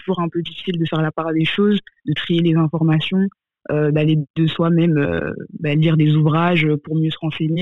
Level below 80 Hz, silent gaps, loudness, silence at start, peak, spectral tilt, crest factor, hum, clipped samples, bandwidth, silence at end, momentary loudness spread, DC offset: -52 dBFS; 4.30-4.34 s; -18 LUFS; 0.05 s; -6 dBFS; -9 dB/octave; 12 dB; none; under 0.1%; 4.1 kHz; 0 s; 9 LU; 0.4%